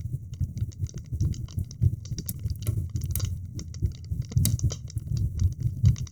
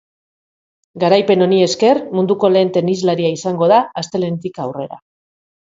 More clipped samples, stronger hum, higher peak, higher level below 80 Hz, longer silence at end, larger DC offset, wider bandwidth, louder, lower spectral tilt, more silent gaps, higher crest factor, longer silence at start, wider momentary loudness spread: neither; neither; second, -6 dBFS vs 0 dBFS; first, -38 dBFS vs -62 dBFS; second, 0 s vs 0.8 s; first, 0.2% vs under 0.1%; first, over 20 kHz vs 7.8 kHz; second, -30 LUFS vs -15 LUFS; about the same, -6 dB/octave vs -6 dB/octave; neither; first, 22 dB vs 16 dB; second, 0 s vs 0.95 s; about the same, 10 LU vs 12 LU